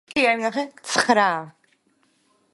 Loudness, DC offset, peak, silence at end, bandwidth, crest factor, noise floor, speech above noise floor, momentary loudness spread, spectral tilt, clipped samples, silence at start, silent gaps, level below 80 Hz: -21 LUFS; under 0.1%; -2 dBFS; 1.05 s; 11.5 kHz; 22 dB; -65 dBFS; 44 dB; 12 LU; -2.5 dB/octave; under 0.1%; 0.15 s; none; -68 dBFS